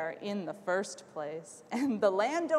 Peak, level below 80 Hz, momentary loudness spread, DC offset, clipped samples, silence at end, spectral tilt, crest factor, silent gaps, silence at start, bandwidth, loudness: -14 dBFS; -82 dBFS; 12 LU; under 0.1%; under 0.1%; 0 s; -4.5 dB/octave; 18 dB; none; 0 s; 13 kHz; -33 LUFS